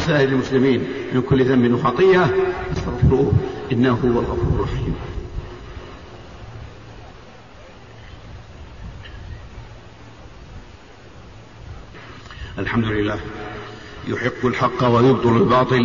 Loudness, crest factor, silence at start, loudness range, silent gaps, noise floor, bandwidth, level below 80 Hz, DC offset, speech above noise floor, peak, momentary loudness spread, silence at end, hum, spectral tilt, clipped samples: -19 LUFS; 16 dB; 0 s; 22 LU; none; -43 dBFS; 7.4 kHz; -36 dBFS; 0.4%; 25 dB; -4 dBFS; 24 LU; 0 s; none; -7.5 dB/octave; under 0.1%